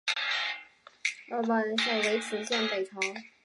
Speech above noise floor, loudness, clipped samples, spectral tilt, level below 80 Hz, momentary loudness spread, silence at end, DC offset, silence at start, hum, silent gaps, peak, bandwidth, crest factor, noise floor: 21 dB; -30 LUFS; under 0.1%; -2 dB/octave; -86 dBFS; 7 LU; 0.15 s; under 0.1%; 0.05 s; none; none; -14 dBFS; 11.5 kHz; 18 dB; -51 dBFS